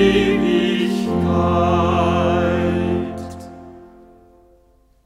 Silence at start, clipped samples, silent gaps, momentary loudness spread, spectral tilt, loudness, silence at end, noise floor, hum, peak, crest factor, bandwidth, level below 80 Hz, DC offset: 0 s; under 0.1%; none; 16 LU; -7 dB/octave; -18 LUFS; 1.2 s; -55 dBFS; none; -2 dBFS; 16 dB; 13 kHz; -38 dBFS; under 0.1%